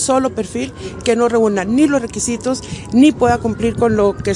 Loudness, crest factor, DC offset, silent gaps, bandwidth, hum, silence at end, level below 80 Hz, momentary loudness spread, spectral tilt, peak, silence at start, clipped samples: -16 LUFS; 14 dB; under 0.1%; none; 11.5 kHz; none; 0 s; -40 dBFS; 10 LU; -5 dB/octave; 0 dBFS; 0 s; under 0.1%